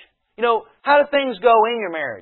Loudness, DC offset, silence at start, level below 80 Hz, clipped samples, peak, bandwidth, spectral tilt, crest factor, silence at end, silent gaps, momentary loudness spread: -18 LUFS; under 0.1%; 0.4 s; -62 dBFS; under 0.1%; -4 dBFS; 4.3 kHz; -8.5 dB/octave; 16 dB; 0 s; none; 8 LU